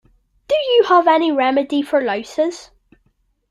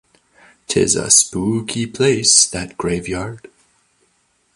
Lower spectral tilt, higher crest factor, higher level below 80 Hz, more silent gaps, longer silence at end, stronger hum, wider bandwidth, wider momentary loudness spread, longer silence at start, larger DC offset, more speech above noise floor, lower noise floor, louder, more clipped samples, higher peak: about the same, -3.5 dB/octave vs -2.5 dB/octave; about the same, 16 dB vs 20 dB; second, -60 dBFS vs -46 dBFS; neither; second, 0.85 s vs 1.2 s; neither; about the same, 12 kHz vs 13 kHz; second, 9 LU vs 13 LU; second, 0.5 s vs 0.7 s; neither; about the same, 47 dB vs 45 dB; about the same, -63 dBFS vs -62 dBFS; about the same, -16 LUFS vs -15 LUFS; neither; about the same, -2 dBFS vs 0 dBFS